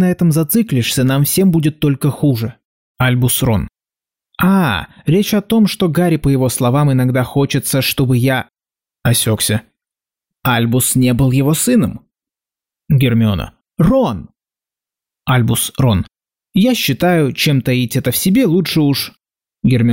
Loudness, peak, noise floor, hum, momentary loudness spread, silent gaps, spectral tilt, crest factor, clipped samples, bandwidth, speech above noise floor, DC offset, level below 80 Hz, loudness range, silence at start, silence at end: -14 LUFS; -4 dBFS; under -90 dBFS; none; 7 LU; 2.65-2.95 s; -5.5 dB/octave; 12 dB; under 0.1%; 16.5 kHz; over 77 dB; 0.2%; -40 dBFS; 3 LU; 0 s; 0 s